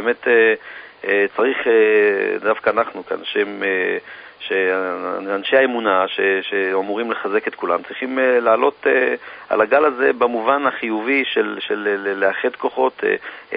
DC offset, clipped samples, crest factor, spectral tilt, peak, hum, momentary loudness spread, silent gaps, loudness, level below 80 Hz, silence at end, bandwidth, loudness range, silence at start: under 0.1%; under 0.1%; 18 dB; -9 dB/octave; -2 dBFS; none; 8 LU; none; -18 LUFS; -66 dBFS; 0 s; 5 kHz; 3 LU; 0 s